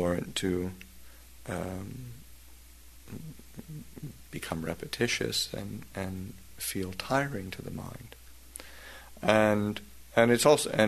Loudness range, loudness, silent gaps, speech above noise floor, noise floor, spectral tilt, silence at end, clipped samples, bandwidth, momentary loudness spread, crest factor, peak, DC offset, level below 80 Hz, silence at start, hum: 13 LU; -30 LUFS; none; 23 dB; -53 dBFS; -4.5 dB/octave; 0 s; under 0.1%; 13.5 kHz; 23 LU; 26 dB; -6 dBFS; 0.2%; -54 dBFS; 0 s; none